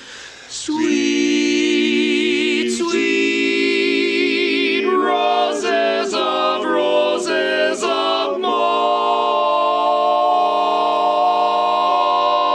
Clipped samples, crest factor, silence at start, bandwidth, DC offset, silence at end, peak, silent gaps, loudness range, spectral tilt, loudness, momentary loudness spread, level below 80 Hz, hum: under 0.1%; 12 dB; 0 s; 11 kHz; under 0.1%; 0 s; -4 dBFS; none; 1 LU; -2.5 dB/octave; -17 LUFS; 3 LU; -62 dBFS; none